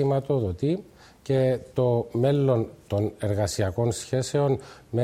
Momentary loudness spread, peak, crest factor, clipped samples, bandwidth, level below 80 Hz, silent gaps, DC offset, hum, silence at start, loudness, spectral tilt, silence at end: 6 LU; -10 dBFS; 14 dB; under 0.1%; 14.5 kHz; -52 dBFS; none; under 0.1%; none; 0 s; -26 LUFS; -7 dB/octave; 0 s